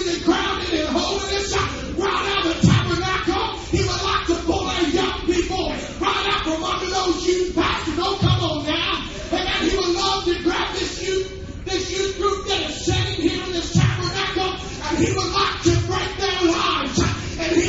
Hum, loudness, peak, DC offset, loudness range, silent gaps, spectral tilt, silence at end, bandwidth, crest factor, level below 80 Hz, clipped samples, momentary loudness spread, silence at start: none; -21 LUFS; -4 dBFS; under 0.1%; 2 LU; none; -4.5 dB/octave; 0 s; 8 kHz; 18 dB; -34 dBFS; under 0.1%; 5 LU; 0 s